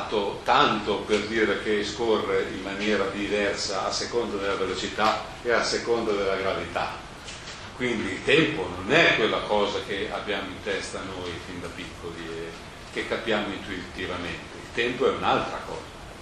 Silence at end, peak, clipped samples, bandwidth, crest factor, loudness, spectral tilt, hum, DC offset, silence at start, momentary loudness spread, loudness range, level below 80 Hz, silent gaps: 0 s; -2 dBFS; under 0.1%; 12.5 kHz; 24 dB; -26 LUFS; -4 dB/octave; none; under 0.1%; 0 s; 15 LU; 8 LU; -50 dBFS; none